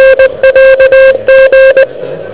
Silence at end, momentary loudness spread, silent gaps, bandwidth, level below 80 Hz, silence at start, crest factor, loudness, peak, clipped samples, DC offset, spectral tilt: 0 s; 6 LU; none; 4 kHz; -34 dBFS; 0 s; 4 dB; -4 LUFS; 0 dBFS; 10%; under 0.1%; -7 dB/octave